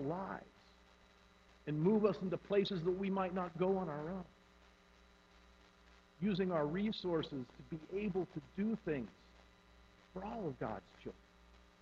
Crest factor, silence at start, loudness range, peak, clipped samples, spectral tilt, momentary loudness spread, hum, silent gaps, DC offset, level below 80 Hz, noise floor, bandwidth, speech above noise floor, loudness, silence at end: 22 dB; 0 s; 6 LU; -20 dBFS; under 0.1%; -8 dB/octave; 15 LU; none; none; under 0.1%; -66 dBFS; -66 dBFS; 7.4 kHz; 27 dB; -39 LUFS; 0.65 s